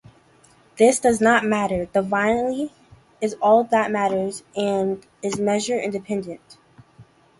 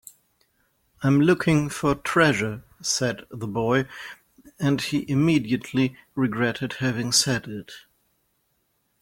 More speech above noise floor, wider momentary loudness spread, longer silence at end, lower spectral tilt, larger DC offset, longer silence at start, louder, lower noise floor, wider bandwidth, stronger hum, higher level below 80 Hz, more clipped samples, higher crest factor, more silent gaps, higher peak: second, 34 dB vs 48 dB; about the same, 12 LU vs 12 LU; second, 0.4 s vs 1.2 s; about the same, -4.5 dB/octave vs -4.5 dB/octave; neither; second, 0.75 s vs 1 s; about the same, -21 LUFS vs -23 LUFS; second, -55 dBFS vs -71 dBFS; second, 11.5 kHz vs 16.5 kHz; neither; about the same, -54 dBFS vs -54 dBFS; neither; about the same, 18 dB vs 20 dB; neither; about the same, -4 dBFS vs -4 dBFS